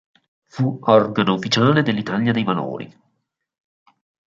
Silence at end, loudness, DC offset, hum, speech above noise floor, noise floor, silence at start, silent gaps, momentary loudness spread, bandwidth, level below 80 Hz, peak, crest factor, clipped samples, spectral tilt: 1.35 s; -19 LUFS; under 0.1%; none; 55 dB; -73 dBFS; 0.55 s; none; 15 LU; 7.8 kHz; -60 dBFS; -2 dBFS; 18 dB; under 0.1%; -6 dB/octave